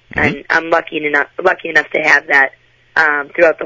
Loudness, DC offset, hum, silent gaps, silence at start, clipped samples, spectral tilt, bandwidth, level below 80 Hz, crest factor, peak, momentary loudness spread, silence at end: -13 LUFS; under 0.1%; none; none; 0.15 s; under 0.1%; -4.5 dB/octave; 8 kHz; -46 dBFS; 14 dB; 0 dBFS; 6 LU; 0 s